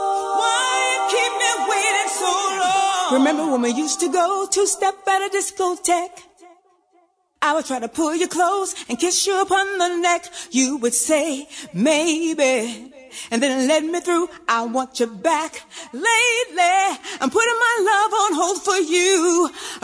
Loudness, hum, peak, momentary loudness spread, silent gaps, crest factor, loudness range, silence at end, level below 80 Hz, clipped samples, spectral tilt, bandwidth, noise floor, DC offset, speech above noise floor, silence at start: -19 LUFS; none; -4 dBFS; 7 LU; none; 16 dB; 4 LU; 0.05 s; -64 dBFS; under 0.1%; -1.5 dB/octave; 11 kHz; -60 dBFS; under 0.1%; 41 dB; 0 s